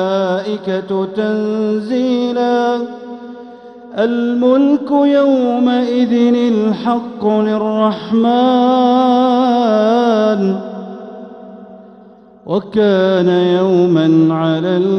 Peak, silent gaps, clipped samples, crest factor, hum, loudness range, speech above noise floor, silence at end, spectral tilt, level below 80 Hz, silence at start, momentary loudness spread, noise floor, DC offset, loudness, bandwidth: -2 dBFS; none; under 0.1%; 12 dB; none; 5 LU; 28 dB; 0 s; -7.5 dB/octave; -60 dBFS; 0 s; 15 LU; -41 dBFS; under 0.1%; -14 LUFS; 6.4 kHz